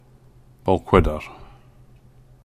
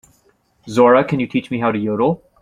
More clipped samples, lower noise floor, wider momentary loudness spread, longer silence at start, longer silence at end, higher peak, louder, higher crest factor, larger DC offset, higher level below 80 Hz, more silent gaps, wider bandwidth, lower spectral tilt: neither; second, -51 dBFS vs -59 dBFS; first, 16 LU vs 8 LU; about the same, 0.65 s vs 0.65 s; first, 1 s vs 0.25 s; about the same, -2 dBFS vs -2 dBFS; second, -21 LUFS vs -17 LUFS; first, 22 dB vs 16 dB; neither; first, -34 dBFS vs -54 dBFS; neither; first, 14.5 kHz vs 10.5 kHz; about the same, -8 dB/octave vs -7 dB/octave